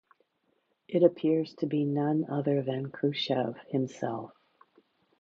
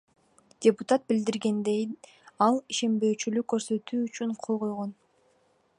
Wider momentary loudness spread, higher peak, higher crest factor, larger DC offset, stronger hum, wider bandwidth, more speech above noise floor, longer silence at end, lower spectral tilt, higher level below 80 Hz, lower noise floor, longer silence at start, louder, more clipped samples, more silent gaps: about the same, 10 LU vs 8 LU; about the same, -8 dBFS vs -8 dBFS; about the same, 22 dB vs 20 dB; neither; neither; second, 7.6 kHz vs 11 kHz; first, 46 dB vs 40 dB; about the same, 0.95 s vs 0.85 s; first, -7.5 dB/octave vs -5 dB/octave; about the same, -78 dBFS vs -76 dBFS; first, -75 dBFS vs -67 dBFS; first, 0.9 s vs 0.6 s; about the same, -30 LUFS vs -28 LUFS; neither; neither